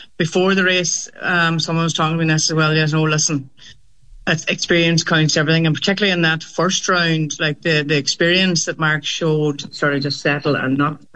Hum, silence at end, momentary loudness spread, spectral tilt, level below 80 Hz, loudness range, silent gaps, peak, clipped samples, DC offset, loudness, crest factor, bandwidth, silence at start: none; 0.2 s; 5 LU; -4 dB/octave; -54 dBFS; 2 LU; none; -4 dBFS; under 0.1%; 0.5%; -17 LUFS; 14 dB; 8.6 kHz; 0 s